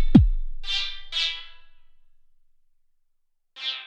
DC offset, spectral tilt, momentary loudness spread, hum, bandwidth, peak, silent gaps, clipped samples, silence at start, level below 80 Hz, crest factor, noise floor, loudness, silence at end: under 0.1%; -6 dB/octave; 15 LU; none; 8 kHz; -2 dBFS; none; under 0.1%; 0 s; -30 dBFS; 22 dB; -68 dBFS; -25 LUFS; 0 s